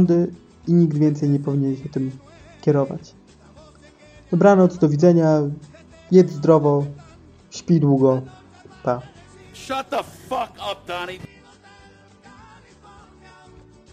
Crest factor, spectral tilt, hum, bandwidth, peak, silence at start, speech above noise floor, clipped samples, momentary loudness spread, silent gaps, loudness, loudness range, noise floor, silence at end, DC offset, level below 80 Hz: 20 dB; -8 dB/octave; none; 9.4 kHz; -2 dBFS; 0 s; 31 dB; under 0.1%; 16 LU; none; -19 LUFS; 14 LU; -49 dBFS; 2.65 s; under 0.1%; -56 dBFS